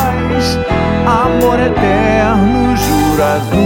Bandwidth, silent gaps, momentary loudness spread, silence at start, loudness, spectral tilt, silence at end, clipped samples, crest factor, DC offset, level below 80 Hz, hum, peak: 17 kHz; none; 3 LU; 0 s; -12 LUFS; -6 dB/octave; 0 s; under 0.1%; 10 dB; under 0.1%; -24 dBFS; none; 0 dBFS